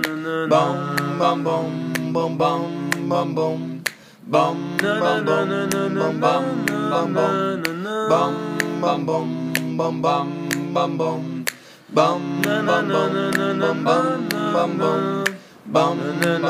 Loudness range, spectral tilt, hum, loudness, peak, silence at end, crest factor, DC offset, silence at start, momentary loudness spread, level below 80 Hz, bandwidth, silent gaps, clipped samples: 2 LU; -5.5 dB/octave; none; -21 LUFS; 0 dBFS; 0 s; 20 dB; under 0.1%; 0 s; 6 LU; -68 dBFS; 15.5 kHz; none; under 0.1%